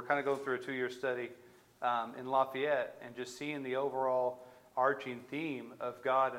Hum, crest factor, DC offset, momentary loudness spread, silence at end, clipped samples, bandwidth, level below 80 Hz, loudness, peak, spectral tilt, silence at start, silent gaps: none; 20 dB; under 0.1%; 10 LU; 0 s; under 0.1%; 16.5 kHz; -84 dBFS; -36 LUFS; -16 dBFS; -5 dB/octave; 0 s; none